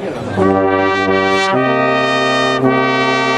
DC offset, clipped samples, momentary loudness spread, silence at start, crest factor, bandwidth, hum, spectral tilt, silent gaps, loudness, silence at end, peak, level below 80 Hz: under 0.1%; under 0.1%; 1 LU; 0 s; 14 dB; 10.5 kHz; none; -5 dB/octave; none; -13 LUFS; 0 s; 0 dBFS; -50 dBFS